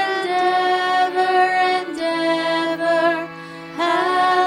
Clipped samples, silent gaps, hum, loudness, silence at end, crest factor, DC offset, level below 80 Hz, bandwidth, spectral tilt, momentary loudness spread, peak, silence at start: under 0.1%; none; none; -18 LUFS; 0 s; 12 dB; under 0.1%; -70 dBFS; 12.5 kHz; -3.5 dB/octave; 7 LU; -6 dBFS; 0 s